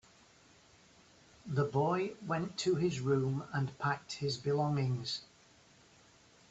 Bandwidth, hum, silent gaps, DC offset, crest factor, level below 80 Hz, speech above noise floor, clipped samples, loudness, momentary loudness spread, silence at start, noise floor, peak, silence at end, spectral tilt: 8.2 kHz; none; none; under 0.1%; 18 dB; -70 dBFS; 29 dB; under 0.1%; -35 LUFS; 6 LU; 1.45 s; -63 dBFS; -18 dBFS; 1.25 s; -6 dB/octave